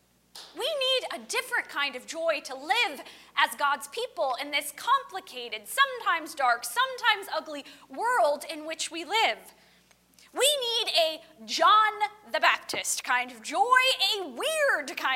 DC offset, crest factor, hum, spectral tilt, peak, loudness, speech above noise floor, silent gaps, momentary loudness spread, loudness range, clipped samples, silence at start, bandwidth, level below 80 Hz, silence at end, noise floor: under 0.1%; 20 dB; 60 Hz at -70 dBFS; 1 dB/octave; -8 dBFS; -26 LUFS; 34 dB; none; 12 LU; 4 LU; under 0.1%; 0.35 s; 16 kHz; -76 dBFS; 0 s; -62 dBFS